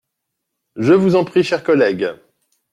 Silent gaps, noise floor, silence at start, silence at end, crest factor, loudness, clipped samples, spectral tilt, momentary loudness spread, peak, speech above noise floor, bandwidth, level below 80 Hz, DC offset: none; -77 dBFS; 0.75 s; 0.55 s; 16 dB; -16 LUFS; under 0.1%; -7 dB/octave; 9 LU; -2 dBFS; 62 dB; 10.5 kHz; -60 dBFS; under 0.1%